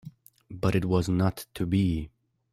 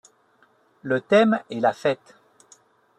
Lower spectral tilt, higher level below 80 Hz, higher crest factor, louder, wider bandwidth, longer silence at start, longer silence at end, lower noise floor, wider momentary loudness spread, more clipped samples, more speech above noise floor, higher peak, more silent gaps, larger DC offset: first, -7.5 dB/octave vs -6 dB/octave; first, -48 dBFS vs -72 dBFS; about the same, 18 dB vs 20 dB; second, -27 LUFS vs -22 LUFS; first, 15.5 kHz vs 9.4 kHz; second, 0.05 s vs 0.85 s; second, 0.45 s vs 1.05 s; second, -48 dBFS vs -61 dBFS; about the same, 12 LU vs 12 LU; neither; second, 22 dB vs 40 dB; second, -10 dBFS vs -6 dBFS; neither; neither